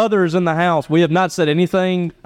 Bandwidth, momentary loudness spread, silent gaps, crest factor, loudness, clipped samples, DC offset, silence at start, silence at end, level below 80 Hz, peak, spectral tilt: 14 kHz; 2 LU; none; 12 dB; -16 LUFS; under 0.1%; under 0.1%; 0 s; 0.15 s; -56 dBFS; -4 dBFS; -6.5 dB/octave